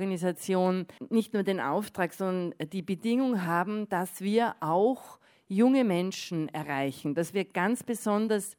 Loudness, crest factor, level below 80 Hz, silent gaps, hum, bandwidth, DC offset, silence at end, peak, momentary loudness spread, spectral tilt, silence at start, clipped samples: -29 LUFS; 16 dB; -78 dBFS; none; none; over 20 kHz; under 0.1%; 0.05 s; -12 dBFS; 7 LU; -6 dB/octave; 0 s; under 0.1%